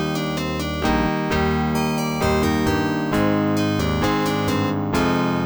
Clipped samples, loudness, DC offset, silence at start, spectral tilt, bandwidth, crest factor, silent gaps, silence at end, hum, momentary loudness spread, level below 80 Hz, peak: under 0.1%; -21 LUFS; 0.2%; 0 s; -6 dB/octave; over 20 kHz; 14 dB; none; 0 s; none; 3 LU; -36 dBFS; -6 dBFS